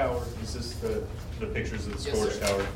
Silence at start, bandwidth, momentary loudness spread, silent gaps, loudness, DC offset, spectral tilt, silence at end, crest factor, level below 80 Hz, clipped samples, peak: 0 s; 16 kHz; 8 LU; none; -32 LUFS; under 0.1%; -5 dB/octave; 0 s; 18 dB; -40 dBFS; under 0.1%; -12 dBFS